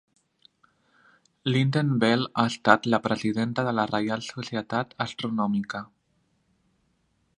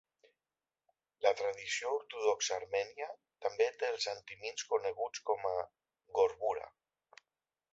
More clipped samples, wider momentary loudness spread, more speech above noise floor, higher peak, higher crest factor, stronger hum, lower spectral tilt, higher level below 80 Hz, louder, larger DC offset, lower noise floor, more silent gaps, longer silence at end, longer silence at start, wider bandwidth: neither; about the same, 11 LU vs 10 LU; second, 45 dB vs over 54 dB; first, 0 dBFS vs -14 dBFS; about the same, 26 dB vs 22 dB; neither; first, -6 dB/octave vs 1 dB/octave; first, -66 dBFS vs -78 dBFS; first, -26 LUFS vs -36 LUFS; neither; second, -70 dBFS vs under -90 dBFS; neither; first, 1.5 s vs 1.05 s; first, 1.45 s vs 1.2 s; first, 11 kHz vs 8 kHz